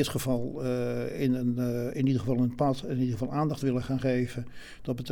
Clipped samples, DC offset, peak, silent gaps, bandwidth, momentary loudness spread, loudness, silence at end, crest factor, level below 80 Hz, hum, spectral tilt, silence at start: under 0.1%; under 0.1%; -14 dBFS; none; 18.5 kHz; 8 LU; -29 LUFS; 0 s; 14 dB; -50 dBFS; none; -7 dB/octave; 0 s